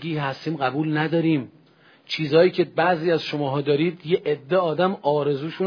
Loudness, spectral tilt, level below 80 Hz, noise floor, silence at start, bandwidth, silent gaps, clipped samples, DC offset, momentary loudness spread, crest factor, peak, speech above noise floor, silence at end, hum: -22 LUFS; -7.5 dB/octave; -70 dBFS; -54 dBFS; 0 s; 5.4 kHz; none; under 0.1%; under 0.1%; 8 LU; 16 dB; -6 dBFS; 33 dB; 0 s; none